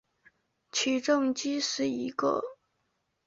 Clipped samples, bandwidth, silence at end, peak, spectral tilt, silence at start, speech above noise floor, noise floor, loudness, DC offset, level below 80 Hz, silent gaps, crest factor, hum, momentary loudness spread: under 0.1%; 8 kHz; 0.75 s; -14 dBFS; -2.5 dB/octave; 0.75 s; 49 dB; -78 dBFS; -29 LUFS; under 0.1%; -74 dBFS; none; 18 dB; none; 7 LU